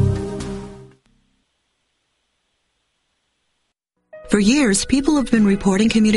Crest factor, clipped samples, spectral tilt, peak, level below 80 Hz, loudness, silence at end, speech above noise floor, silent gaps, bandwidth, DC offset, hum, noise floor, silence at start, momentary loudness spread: 18 dB; under 0.1%; -5 dB/octave; -2 dBFS; -40 dBFS; -17 LUFS; 0 s; 57 dB; none; 11.5 kHz; under 0.1%; none; -72 dBFS; 0 s; 15 LU